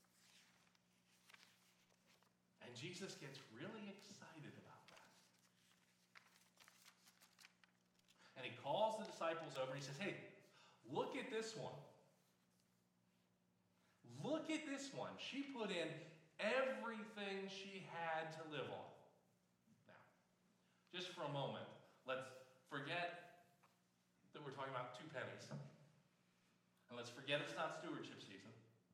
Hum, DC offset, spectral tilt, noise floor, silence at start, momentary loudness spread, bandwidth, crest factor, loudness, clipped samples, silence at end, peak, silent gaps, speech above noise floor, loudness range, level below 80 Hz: 60 Hz at -85 dBFS; under 0.1%; -4.5 dB/octave; -81 dBFS; 0.2 s; 23 LU; 16 kHz; 24 dB; -49 LUFS; under 0.1%; 0.25 s; -28 dBFS; none; 33 dB; 13 LU; under -90 dBFS